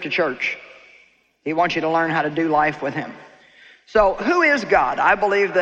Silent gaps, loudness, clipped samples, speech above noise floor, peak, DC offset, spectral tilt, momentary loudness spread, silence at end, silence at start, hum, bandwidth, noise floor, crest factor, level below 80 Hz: none; -19 LUFS; under 0.1%; 36 dB; -4 dBFS; under 0.1%; -5.5 dB/octave; 10 LU; 0 s; 0 s; none; 8.2 kHz; -55 dBFS; 16 dB; -48 dBFS